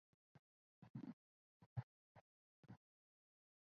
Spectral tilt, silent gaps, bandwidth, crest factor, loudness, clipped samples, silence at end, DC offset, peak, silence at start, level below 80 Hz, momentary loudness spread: -9 dB/octave; 0.39-0.82 s, 0.90-0.94 s, 1.13-1.60 s, 1.66-1.76 s, 1.83-2.15 s, 2.21-2.63 s; 6.2 kHz; 24 dB; -59 LUFS; under 0.1%; 0.85 s; under 0.1%; -36 dBFS; 0.35 s; -82 dBFS; 13 LU